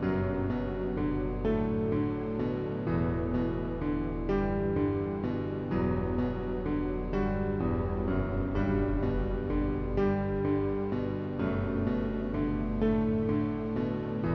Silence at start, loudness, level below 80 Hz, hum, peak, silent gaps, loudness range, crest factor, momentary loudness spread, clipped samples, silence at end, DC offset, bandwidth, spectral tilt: 0 s; -31 LUFS; -40 dBFS; none; -16 dBFS; none; 1 LU; 14 dB; 3 LU; under 0.1%; 0 s; under 0.1%; 6 kHz; -10.5 dB/octave